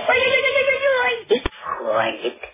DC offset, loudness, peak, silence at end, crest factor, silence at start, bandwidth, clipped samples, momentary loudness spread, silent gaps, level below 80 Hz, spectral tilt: under 0.1%; -19 LUFS; -6 dBFS; 0.05 s; 14 dB; 0 s; 3.9 kHz; under 0.1%; 11 LU; none; -44 dBFS; -6.5 dB/octave